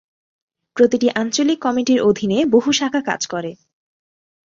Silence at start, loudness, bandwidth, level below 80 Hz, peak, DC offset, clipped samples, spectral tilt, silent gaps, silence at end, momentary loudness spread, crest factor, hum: 0.75 s; -17 LUFS; 7.8 kHz; -60 dBFS; -2 dBFS; under 0.1%; under 0.1%; -4 dB/octave; none; 0.95 s; 9 LU; 16 dB; none